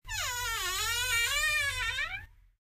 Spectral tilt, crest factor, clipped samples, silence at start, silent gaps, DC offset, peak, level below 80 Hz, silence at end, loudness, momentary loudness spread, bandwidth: 0.5 dB/octave; 14 dB; under 0.1%; 0.05 s; none; under 0.1%; -18 dBFS; -48 dBFS; 0.35 s; -29 LUFS; 7 LU; 15.5 kHz